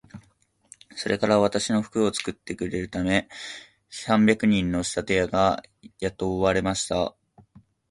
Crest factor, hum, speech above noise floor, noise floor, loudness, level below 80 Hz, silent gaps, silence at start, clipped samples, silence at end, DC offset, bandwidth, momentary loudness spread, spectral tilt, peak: 22 dB; none; 40 dB; -64 dBFS; -24 LUFS; -48 dBFS; none; 0.15 s; under 0.1%; 0.8 s; under 0.1%; 11.5 kHz; 14 LU; -5 dB/octave; -4 dBFS